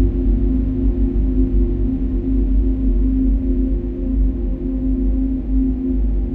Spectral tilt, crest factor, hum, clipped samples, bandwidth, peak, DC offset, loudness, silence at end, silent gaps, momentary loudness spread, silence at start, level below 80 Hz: -12.5 dB/octave; 12 dB; none; under 0.1%; 2.1 kHz; -6 dBFS; under 0.1%; -20 LUFS; 0 s; none; 3 LU; 0 s; -18 dBFS